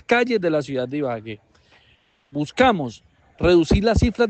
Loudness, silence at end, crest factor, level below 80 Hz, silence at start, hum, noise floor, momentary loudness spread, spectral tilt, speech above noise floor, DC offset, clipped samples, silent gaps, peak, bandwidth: -20 LUFS; 0 s; 18 dB; -34 dBFS; 0.1 s; none; -59 dBFS; 15 LU; -6.5 dB/octave; 40 dB; under 0.1%; under 0.1%; none; -4 dBFS; 8.6 kHz